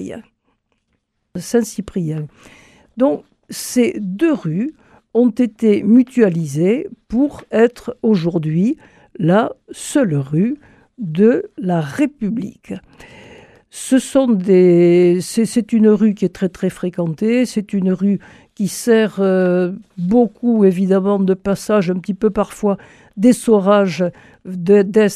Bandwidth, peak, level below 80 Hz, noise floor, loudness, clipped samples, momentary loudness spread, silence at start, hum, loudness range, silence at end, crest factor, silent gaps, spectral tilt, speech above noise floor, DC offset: 14.5 kHz; 0 dBFS; -52 dBFS; -68 dBFS; -16 LUFS; under 0.1%; 14 LU; 0 s; none; 6 LU; 0 s; 16 dB; none; -7 dB/octave; 53 dB; under 0.1%